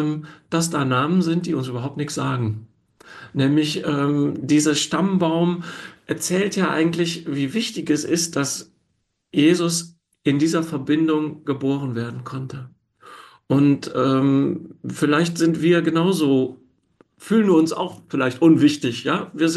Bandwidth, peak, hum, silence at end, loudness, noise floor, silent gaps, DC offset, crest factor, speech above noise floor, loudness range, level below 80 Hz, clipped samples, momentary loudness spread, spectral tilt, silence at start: 12.5 kHz; -4 dBFS; none; 0 s; -21 LUFS; -71 dBFS; none; under 0.1%; 16 dB; 51 dB; 4 LU; -64 dBFS; under 0.1%; 11 LU; -5.5 dB/octave; 0 s